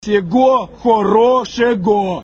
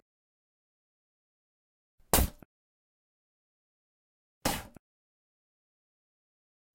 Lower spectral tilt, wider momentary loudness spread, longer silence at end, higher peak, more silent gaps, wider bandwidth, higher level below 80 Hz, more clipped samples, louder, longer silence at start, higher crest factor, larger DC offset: first, -6 dB/octave vs -3.5 dB/octave; second, 4 LU vs 8 LU; second, 0 s vs 2.05 s; first, 0 dBFS vs -10 dBFS; second, none vs 2.45-4.41 s; second, 7.6 kHz vs 16.5 kHz; about the same, -46 dBFS vs -46 dBFS; neither; first, -14 LUFS vs -31 LUFS; second, 0.05 s vs 2.15 s; second, 12 dB vs 30 dB; neither